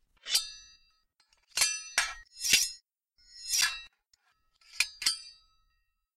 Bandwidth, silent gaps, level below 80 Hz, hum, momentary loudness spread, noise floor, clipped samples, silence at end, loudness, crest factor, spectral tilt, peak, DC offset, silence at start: 16 kHz; none; -64 dBFS; none; 18 LU; -76 dBFS; under 0.1%; 0.85 s; -29 LUFS; 26 dB; 3 dB/octave; -10 dBFS; under 0.1%; 0.25 s